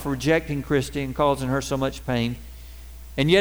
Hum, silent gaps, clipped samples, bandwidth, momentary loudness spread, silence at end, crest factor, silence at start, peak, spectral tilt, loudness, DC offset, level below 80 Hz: none; none; under 0.1%; over 20 kHz; 20 LU; 0 s; 18 dB; 0 s; -4 dBFS; -5.5 dB/octave; -24 LUFS; 0.3%; -40 dBFS